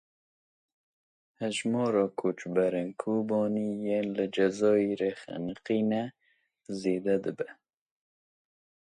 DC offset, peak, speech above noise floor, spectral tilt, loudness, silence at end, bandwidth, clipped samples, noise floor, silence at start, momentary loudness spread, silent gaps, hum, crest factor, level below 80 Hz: under 0.1%; -14 dBFS; 42 dB; -6 dB/octave; -30 LUFS; 1.4 s; 10.5 kHz; under 0.1%; -71 dBFS; 1.4 s; 11 LU; none; none; 18 dB; -72 dBFS